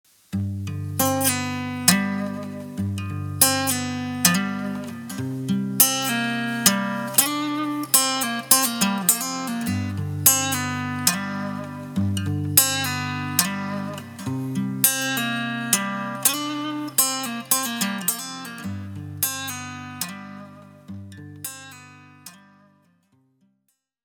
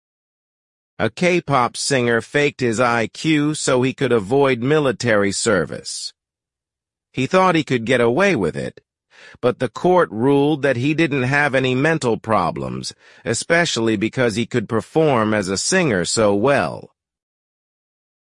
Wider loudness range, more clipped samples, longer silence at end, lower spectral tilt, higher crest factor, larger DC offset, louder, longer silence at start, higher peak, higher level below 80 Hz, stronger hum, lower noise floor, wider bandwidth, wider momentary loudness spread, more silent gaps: first, 12 LU vs 2 LU; neither; first, 1.7 s vs 1.45 s; second, -2.5 dB/octave vs -4.5 dB/octave; first, 24 dB vs 16 dB; neither; second, -22 LUFS vs -18 LUFS; second, 0.3 s vs 1 s; about the same, 0 dBFS vs -2 dBFS; second, -68 dBFS vs -54 dBFS; neither; second, -73 dBFS vs -87 dBFS; first, over 20 kHz vs 11.5 kHz; first, 16 LU vs 9 LU; neither